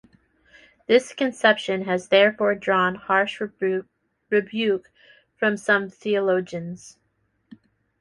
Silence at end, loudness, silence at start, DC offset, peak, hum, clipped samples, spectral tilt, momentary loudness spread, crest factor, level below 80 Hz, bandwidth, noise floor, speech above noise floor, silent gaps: 1.1 s; -22 LUFS; 0.9 s; under 0.1%; -4 dBFS; none; under 0.1%; -5 dB/octave; 10 LU; 20 dB; -68 dBFS; 11.5 kHz; -70 dBFS; 48 dB; none